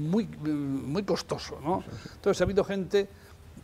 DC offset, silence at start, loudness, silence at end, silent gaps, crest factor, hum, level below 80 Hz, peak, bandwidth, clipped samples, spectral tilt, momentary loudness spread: under 0.1%; 0 s; -30 LUFS; 0.05 s; none; 18 dB; none; -50 dBFS; -10 dBFS; 15.5 kHz; under 0.1%; -6 dB/octave; 9 LU